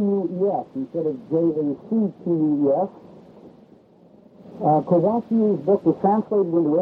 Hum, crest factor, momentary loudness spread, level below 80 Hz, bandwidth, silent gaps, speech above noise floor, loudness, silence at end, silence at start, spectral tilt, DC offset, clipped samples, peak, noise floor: none; 16 dB; 7 LU; -66 dBFS; 4.5 kHz; none; 31 dB; -22 LUFS; 0 s; 0 s; -12 dB/octave; under 0.1%; under 0.1%; -6 dBFS; -51 dBFS